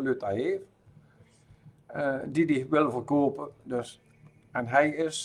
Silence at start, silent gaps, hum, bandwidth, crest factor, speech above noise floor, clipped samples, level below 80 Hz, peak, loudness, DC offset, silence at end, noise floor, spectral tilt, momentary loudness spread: 0 s; none; none; 11.5 kHz; 22 dB; 31 dB; under 0.1%; -68 dBFS; -8 dBFS; -28 LUFS; under 0.1%; 0 s; -59 dBFS; -5.5 dB/octave; 12 LU